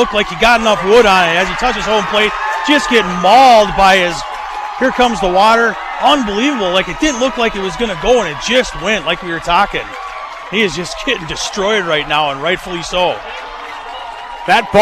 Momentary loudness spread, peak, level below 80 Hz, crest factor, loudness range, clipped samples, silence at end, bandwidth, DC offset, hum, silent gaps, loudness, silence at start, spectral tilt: 14 LU; -2 dBFS; -36 dBFS; 12 dB; 6 LU; under 0.1%; 0 s; 15.5 kHz; under 0.1%; none; none; -12 LUFS; 0 s; -3.5 dB/octave